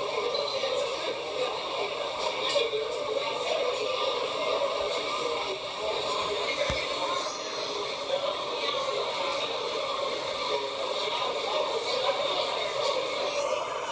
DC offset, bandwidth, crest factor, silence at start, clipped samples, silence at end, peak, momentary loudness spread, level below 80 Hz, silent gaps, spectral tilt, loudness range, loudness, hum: under 0.1%; 8 kHz; 16 dB; 0 s; under 0.1%; 0 s; -14 dBFS; 3 LU; -58 dBFS; none; -2 dB/octave; 1 LU; -29 LUFS; none